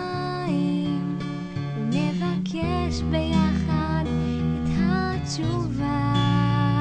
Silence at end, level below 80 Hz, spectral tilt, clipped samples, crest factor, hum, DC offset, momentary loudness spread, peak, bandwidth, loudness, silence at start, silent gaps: 0 s; -38 dBFS; -7 dB/octave; under 0.1%; 14 dB; none; under 0.1%; 6 LU; -10 dBFS; 9.4 kHz; -25 LUFS; 0 s; none